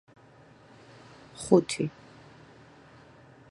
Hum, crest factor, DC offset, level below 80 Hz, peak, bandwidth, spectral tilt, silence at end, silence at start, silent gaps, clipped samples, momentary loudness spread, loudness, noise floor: none; 28 dB; under 0.1%; -66 dBFS; -6 dBFS; 11.5 kHz; -5.5 dB/octave; 1.6 s; 1.4 s; none; under 0.1%; 28 LU; -27 LUFS; -55 dBFS